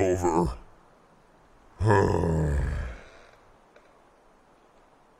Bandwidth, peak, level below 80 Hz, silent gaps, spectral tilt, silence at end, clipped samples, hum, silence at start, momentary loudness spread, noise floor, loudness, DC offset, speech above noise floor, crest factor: 14.5 kHz; -6 dBFS; -38 dBFS; none; -7.5 dB/octave; 2.1 s; under 0.1%; none; 0 s; 18 LU; -58 dBFS; -26 LUFS; under 0.1%; 35 dB; 22 dB